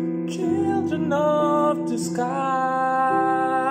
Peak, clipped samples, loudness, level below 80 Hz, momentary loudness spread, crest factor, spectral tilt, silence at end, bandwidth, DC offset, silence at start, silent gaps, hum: -10 dBFS; under 0.1%; -22 LUFS; -70 dBFS; 5 LU; 12 dB; -6 dB/octave; 0 s; 15.5 kHz; under 0.1%; 0 s; none; none